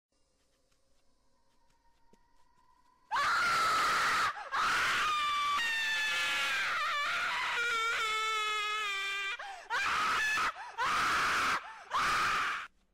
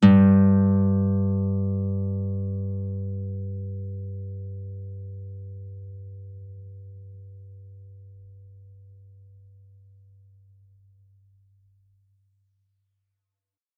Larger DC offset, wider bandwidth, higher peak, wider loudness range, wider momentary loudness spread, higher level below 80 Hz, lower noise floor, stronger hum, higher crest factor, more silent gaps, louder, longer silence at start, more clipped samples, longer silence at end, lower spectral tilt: neither; first, 16 kHz vs 2.8 kHz; second, -24 dBFS vs -4 dBFS; second, 3 LU vs 25 LU; second, 7 LU vs 26 LU; about the same, -64 dBFS vs -66 dBFS; second, -73 dBFS vs -89 dBFS; neither; second, 10 dB vs 24 dB; neither; second, -31 LUFS vs -24 LUFS; first, 3.1 s vs 0 s; neither; second, 0.25 s vs 5.4 s; second, 0 dB/octave vs -9.5 dB/octave